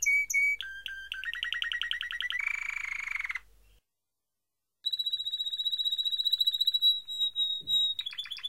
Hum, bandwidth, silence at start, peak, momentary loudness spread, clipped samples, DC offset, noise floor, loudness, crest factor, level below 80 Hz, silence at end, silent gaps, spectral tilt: none; 16 kHz; 0 s; -16 dBFS; 12 LU; under 0.1%; 0.1%; -88 dBFS; -29 LUFS; 16 dB; -66 dBFS; 0 s; none; 4 dB/octave